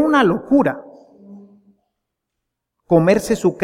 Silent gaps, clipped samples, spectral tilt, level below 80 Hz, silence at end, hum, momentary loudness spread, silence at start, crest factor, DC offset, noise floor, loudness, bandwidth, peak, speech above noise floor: none; under 0.1%; -6.5 dB/octave; -50 dBFS; 0 s; none; 6 LU; 0 s; 16 dB; under 0.1%; -79 dBFS; -16 LUFS; 16 kHz; -2 dBFS; 64 dB